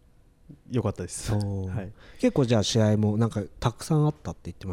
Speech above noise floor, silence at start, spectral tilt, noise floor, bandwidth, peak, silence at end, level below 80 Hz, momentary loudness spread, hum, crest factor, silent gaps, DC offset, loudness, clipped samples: 30 dB; 0.5 s; -6 dB/octave; -56 dBFS; 14 kHz; -10 dBFS; 0 s; -48 dBFS; 14 LU; none; 18 dB; none; under 0.1%; -26 LUFS; under 0.1%